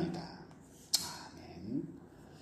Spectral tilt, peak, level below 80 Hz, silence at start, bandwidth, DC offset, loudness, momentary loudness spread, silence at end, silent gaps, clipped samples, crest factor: -3 dB/octave; -14 dBFS; -68 dBFS; 0 s; 15 kHz; under 0.1%; -39 LUFS; 21 LU; 0 s; none; under 0.1%; 28 dB